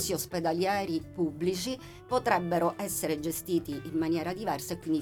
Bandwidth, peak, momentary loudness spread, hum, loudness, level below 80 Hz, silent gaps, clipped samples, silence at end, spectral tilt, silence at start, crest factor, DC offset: 19 kHz; -12 dBFS; 7 LU; none; -31 LUFS; -58 dBFS; none; under 0.1%; 0 s; -4.5 dB/octave; 0 s; 20 dB; under 0.1%